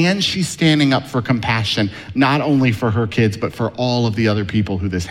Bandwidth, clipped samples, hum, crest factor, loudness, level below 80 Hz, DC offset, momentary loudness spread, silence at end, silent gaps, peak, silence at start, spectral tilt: 15.5 kHz; under 0.1%; none; 14 dB; -17 LUFS; -44 dBFS; under 0.1%; 6 LU; 0 s; none; -4 dBFS; 0 s; -5.5 dB/octave